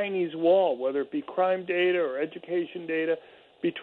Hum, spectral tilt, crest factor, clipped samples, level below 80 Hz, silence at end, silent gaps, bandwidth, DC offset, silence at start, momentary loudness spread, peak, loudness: none; -8.5 dB/octave; 16 dB; under 0.1%; -78 dBFS; 0 s; none; 4.3 kHz; under 0.1%; 0 s; 9 LU; -12 dBFS; -27 LUFS